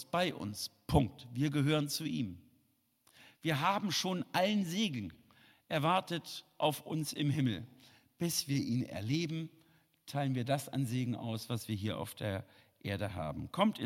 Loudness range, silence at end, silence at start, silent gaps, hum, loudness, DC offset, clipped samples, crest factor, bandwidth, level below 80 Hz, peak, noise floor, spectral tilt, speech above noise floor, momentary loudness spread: 3 LU; 0 s; 0 s; none; none; -35 LUFS; under 0.1%; under 0.1%; 22 dB; 16.5 kHz; -60 dBFS; -14 dBFS; -75 dBFS; -5 dB/octave; 40 dB; 10 LU